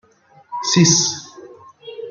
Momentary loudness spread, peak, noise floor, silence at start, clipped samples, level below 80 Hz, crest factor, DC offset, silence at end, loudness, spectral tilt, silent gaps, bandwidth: 22 LU; 0 dBFS; -52 dBFS; 0.5 s; under 0.1%; -58 dBFS; 20 dB; under 0.1%; 0 s; -15 LUFS; -3 dB/octave; none; 10 kHz